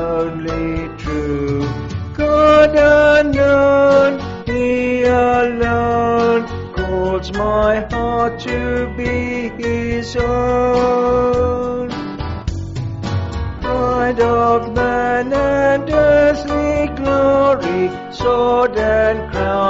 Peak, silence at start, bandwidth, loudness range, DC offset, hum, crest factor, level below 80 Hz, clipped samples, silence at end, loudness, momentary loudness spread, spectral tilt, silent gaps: -2 dBFS; 0 s; 7.8 kHz; 6 LU; under 0.1%; none; 14 dB; -32 dBFS; under 0.1%; 0 s; -16 LUFS; 12 LU; -5 dB/octave; none